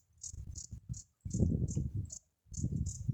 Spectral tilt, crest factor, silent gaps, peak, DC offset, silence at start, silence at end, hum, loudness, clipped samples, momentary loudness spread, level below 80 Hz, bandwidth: -7 dB/octave; 22 dB; none; -16 dBFS; under 0.1%; 0.2 s; 0 s; none; -39 LUFS; under 0.1%; 14 LU; -46 dBFS; 10 kHz